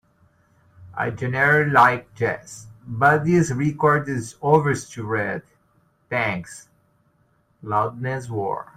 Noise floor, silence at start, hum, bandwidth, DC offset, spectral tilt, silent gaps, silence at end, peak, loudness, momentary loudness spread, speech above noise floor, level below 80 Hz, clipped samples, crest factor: -63 dBFS; 0.8 s; none; 15.5 kHz; under 0.1%; -6.5 dB/octave; none; 0.15 s; -2 dBFS; -21 LUFS; 18 LU; 42 dB; -56 dBFS; under 0.1%; 20 dB